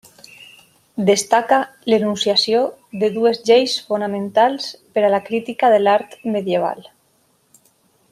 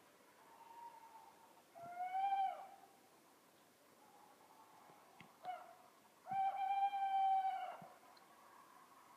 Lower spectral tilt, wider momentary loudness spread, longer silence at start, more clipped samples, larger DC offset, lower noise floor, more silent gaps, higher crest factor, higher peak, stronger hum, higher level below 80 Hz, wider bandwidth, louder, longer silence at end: about the same, -4 dB/octave vs -3 dB/octave; second, 9 LU vs 26 LU; first, 0.95 s vs 0.4 s; neither; neither; second, -61 dBFS vs -69 dBFS; neither; about the same, 18 dB vs 16 dB; first, 0 dBFS vs -30 dBFS; neither; first, -68 dBFS vs under -90 dBFS; about the same, 15 kHz vs 15.5 kHz; first, -18 LUFS vs -42 LUFS; first, 1.3 s vs 0 s